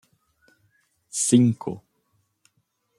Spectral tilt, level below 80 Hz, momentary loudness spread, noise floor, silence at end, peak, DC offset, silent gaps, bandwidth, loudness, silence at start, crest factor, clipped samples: -5.5 dB/octave; -68 dBFS; 17 LU; -72 dBFS; 1.2 s; -4 dBFS; under 0.1%; none; 13 kHz; -22 LUFS; 1.15 s; 22 dB; under 0.1%